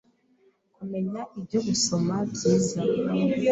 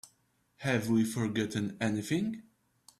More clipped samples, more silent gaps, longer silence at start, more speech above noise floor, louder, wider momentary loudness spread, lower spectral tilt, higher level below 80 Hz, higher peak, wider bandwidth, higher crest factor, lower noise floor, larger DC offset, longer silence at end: neither; neither; first, 0.8 s vs 0.05 s; about the same, 39 dB vs 41 dB; first, -26 LUFS vs -32 LUFS; about the same, 10 LU vs 9 LU; about the same, -5 dB/octave vs -5.5 dB/octave; first, -60 dBFS vs -68 dBFS; first, -10 dBFS vs -14 dBFS; second, 8.4 kHz vs 14.5 kHz; about the same, 16 dB vs 18 dB; second, -64 dBFS vs -72 dBFS; neither; second, 0 s vs 0.6 s